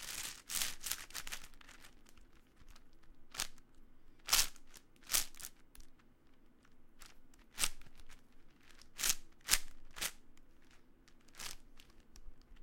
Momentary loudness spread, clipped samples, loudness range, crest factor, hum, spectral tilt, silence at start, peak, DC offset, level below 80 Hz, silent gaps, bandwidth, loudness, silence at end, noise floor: 27 LU; under 0.1%; 8 LU; 34 dB; none; 1 dB/octave; 0 s; -8 dBFS; under 0.1%; -54 dBFS; none; 17 kHz; -38 LUFS; 0 s; -62 dBFS